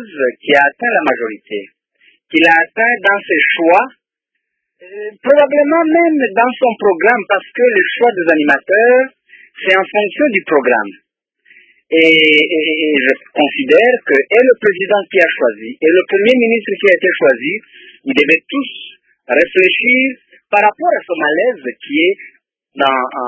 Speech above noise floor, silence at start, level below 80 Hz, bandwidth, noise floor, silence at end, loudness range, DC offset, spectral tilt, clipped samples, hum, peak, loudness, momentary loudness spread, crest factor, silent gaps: 63 dB; 0 s; -64 dBFS; 8 kHz; -75 dBFS; 0 s; 2 LU; under 0.1%; -5.5 dB/octave; under 0.1%; none; 0 dBFS; -12 LUFS; 10 LU; 14 dB; none